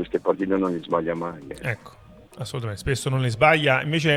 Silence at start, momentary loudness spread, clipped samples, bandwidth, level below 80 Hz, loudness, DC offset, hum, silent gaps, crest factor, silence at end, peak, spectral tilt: 0 s; 15 LU; under 0.1%; 14.5 kHz; -48 dBFS; -23 LUFS; under 0.1%; none; none; 20 dB; 0 s; -4 dBFS; -5.5 dB/octave